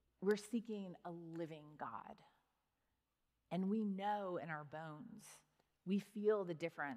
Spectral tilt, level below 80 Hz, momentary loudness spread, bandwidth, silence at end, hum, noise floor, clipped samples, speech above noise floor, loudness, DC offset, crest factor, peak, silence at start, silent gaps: -6.5 dB/octave; -88 dBFS; 16 LU; 15 kHz; 0 s; none; -87 dBFS; under 0.1%; 44 dB; -44 LUFS; under 0.1%; 18 dB; -26 dBFS; 0.2 s; none